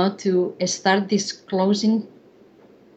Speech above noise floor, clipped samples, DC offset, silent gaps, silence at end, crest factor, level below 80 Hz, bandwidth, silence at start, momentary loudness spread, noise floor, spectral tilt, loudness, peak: 30 dB; under 0.1%; under 0.1%; none; 0.9 s; 18 dB; -70 dBFS; 8.4 kHz; 0 s; 6 LU; -51 dBFS; -4.5 dB/octave; -21 LUFS; -4 dBFS